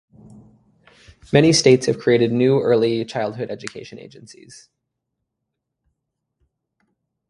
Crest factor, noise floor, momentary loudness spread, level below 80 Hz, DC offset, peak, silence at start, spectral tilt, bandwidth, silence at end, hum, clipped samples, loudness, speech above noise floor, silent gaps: 22 dB; -79 dBFS; 20 LU; -56 dBFS; under 0.1%; 0 dBFS; 1.3 s; -5 dB/octave; 11.5 kHz; 3.3 s; none; under 0.1%; -17 LUFS; 61 dB; none